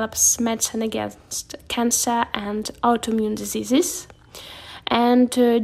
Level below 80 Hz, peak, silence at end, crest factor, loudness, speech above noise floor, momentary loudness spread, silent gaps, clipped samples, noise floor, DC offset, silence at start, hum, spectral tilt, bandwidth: -52 dBFS; -4 dBFS; 0 s; 18 dB; -21 LUFS; 20 dB; 16 LU; none; under 0.1%; -41 dBFS; under 0.1%; 0 s; none; -2.5 dB/octave; 16 kHz